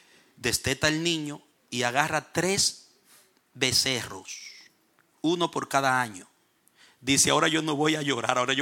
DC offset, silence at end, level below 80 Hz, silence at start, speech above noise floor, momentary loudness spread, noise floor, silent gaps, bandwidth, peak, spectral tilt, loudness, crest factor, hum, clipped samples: under 0.1%; 0 s; -58 dBFS; 0.4 s; 40 dB; 16 LU; -66 dBFS; none; 17.5 kHz; -6 dBFS; -2.5 dB/octave; -25 LUFS; 22 dB; none; under 0.1%